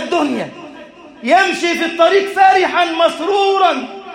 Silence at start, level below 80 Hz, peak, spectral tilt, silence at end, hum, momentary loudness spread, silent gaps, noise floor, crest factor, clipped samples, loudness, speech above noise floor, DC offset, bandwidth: 0 s; -62 dBFS; 0 dBFS; -3 dB/octave; 0 s; none; 12 LU; none; -37 dBFS; 14 dB; under 0.1%; -14 LUFS; 23 dB; under 0.1%; 15.5 kHz